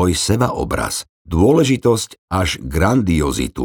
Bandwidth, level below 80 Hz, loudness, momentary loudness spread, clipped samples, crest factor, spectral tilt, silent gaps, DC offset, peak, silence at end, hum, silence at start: 19.5 kHz; -32 dBFS; -17 LUFS; 9 LU; under 0.1%; 16 dB; -5 dB/octave; 1.09-1.25 s, 2.18-2.28 s; under 0.1%; 0 dBFS; 0 s; none; 0 s